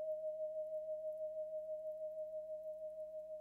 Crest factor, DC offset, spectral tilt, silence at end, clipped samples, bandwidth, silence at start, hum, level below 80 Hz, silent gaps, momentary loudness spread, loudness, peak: 10 dB; under 0.1%; -6.5 dB/octave; 0 s; under 0.1%; 1.1 kHz; 0 s; 60 Hz at -80 dBFS; -82 dBFS; none; 5 LU; -46 LUFS; -36 dBFS